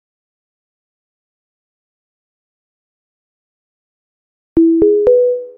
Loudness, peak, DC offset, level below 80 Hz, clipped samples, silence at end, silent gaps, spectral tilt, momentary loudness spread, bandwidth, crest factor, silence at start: -12 LUFS; 0 dBFS; under 0.1%; -46 dBFS; under 0.1%; 0.1 s; none; -10.5 dB/octave; 4 LU; 2.5 kHz; 18 dB; 4.55 s